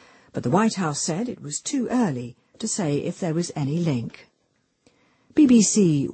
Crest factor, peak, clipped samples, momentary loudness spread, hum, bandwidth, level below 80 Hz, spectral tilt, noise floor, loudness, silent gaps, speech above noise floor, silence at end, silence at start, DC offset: 16 dB; -6 dBFS; under 0.1%; 14 LU; none; 8.8 kHz; -62 dBFS; -5 dB/octave; -69 dBFS; -23 LUFS; none; 47 dB; 0 s; 0.35 s; under 0.1%